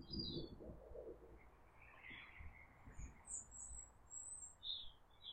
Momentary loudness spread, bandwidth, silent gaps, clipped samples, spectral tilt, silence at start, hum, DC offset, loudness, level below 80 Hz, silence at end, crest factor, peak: 15 LU; 10 kHz; none; under 0.1%; -2.5 dB/octave; 0 s; none; under 0.1%; -53 LUFS; -62 dBFS; 0 s; 20 dB; -34 dBFS